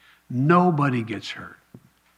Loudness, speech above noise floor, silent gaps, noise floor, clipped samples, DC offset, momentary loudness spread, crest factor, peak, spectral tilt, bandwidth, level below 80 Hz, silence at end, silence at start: -22 LUFS; 30 dB; none; -52 dBFS; under 0.1%; under 0.1%; 18 LU; 20 dB; -4 dBFS; -7.5 dB/octave; 9.8 kHz; -68 dBFS; 0.65 s; 0.3 s